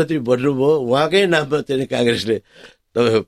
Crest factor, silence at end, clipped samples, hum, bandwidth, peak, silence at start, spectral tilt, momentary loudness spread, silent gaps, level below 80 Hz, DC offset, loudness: 14 dB; 0.05 s; under 0.1%; none; 13 kHz; -2 dBFS; 0 s; -5.5 dB/octave; 7 LU; none; -56 dBFS; under 0.1%; -18 LUFS